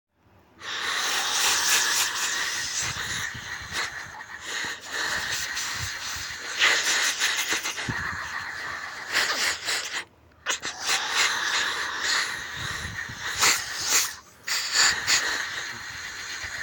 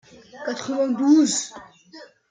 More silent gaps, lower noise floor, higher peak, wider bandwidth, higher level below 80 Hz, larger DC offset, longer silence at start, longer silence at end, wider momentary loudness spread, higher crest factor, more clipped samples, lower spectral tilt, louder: neither; first, -58 dBFS vs -47 dBFS; about the same, -6 dBFS vs -6 dBFS; first, 17.5 kHz vs 9.6 kHz; first, -56 dBFS vs -72 dBFS; neither; first, 0.55 s vs 0.35 s; second, 0 s vs 0.25 s; second, 13 LU vs 16 LU; first, 22 dB vs 16 dB; neither; second, 0.5 dB/octave vs -3 dB/octave; second, -25 LUFS vs -21 LUFS